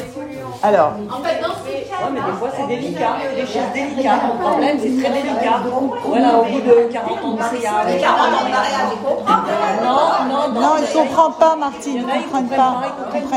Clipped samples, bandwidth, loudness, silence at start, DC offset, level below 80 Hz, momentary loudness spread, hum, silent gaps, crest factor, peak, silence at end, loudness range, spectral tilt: under 0.1%; 15 kHz; -17 LUFS; 0 s; under 0.1%; -58 dBFS; 8 LU; none; none; 16 dB; 0 dBFS; 0 s; 4 LU; -5 dB/octave